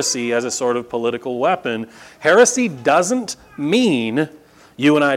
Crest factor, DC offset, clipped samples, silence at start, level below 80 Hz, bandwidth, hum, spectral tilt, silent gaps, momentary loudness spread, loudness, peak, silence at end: 18 dB; under 0.1%; under 0.1%; 0 s; -62 dBFS; 15.5 kHz; none; -3.5 dB/octave; none; 12 LU; -18 LUFS; 0 dBFS; 0 s